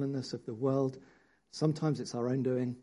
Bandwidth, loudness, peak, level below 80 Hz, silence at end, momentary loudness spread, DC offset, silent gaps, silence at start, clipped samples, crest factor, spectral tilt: 11 kHz; -34 LUFS; -16 dBFS; -74 dBFS; 0 s; 9 LU; under 0.1%; none; 0 s; under 0.1%; 18 dB; -7 dB/octave